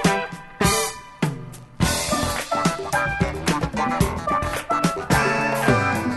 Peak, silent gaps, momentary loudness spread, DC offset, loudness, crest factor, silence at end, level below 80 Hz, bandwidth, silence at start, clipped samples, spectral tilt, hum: -2 dBFS; none; 8 LU; under 0.1%; -22 LUFS; 20 dB; 0 s; -36 dBFS; 12.5 kHz; 0 s; under 0.1%; -4.5 dB/octave; none